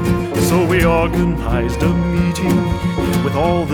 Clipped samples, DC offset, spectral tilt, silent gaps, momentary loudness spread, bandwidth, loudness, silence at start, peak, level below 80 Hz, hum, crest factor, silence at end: under 0.1%; under 0.1%; -6.5 dB/octave; none; 5 LU; 18 kHz; -16 LUFS; 0 s; -2 dBFS; -26 dBFS; none; 14 dB; 0 s